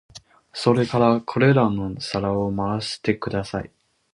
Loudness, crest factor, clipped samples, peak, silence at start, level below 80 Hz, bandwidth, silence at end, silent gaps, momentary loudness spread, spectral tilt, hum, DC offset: -22 LUFS; 18 dB; under 0.1%; -4 dBFS; 0.15 s; -50 dBFS; 11 kHz; 0.5 s; none; 11 LU; -6.5 dB/octave; none; under 0.1%